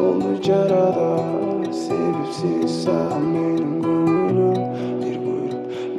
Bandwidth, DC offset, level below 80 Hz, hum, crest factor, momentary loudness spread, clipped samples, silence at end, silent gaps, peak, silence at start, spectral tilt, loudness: 11 kHz; under 0.1%; -62 dBFS; none; 14 dB; 7 LU; under 0.1%; 0 s; none; -6 dBFS; 0 s; -7.5 dB/octave; -21 LUFS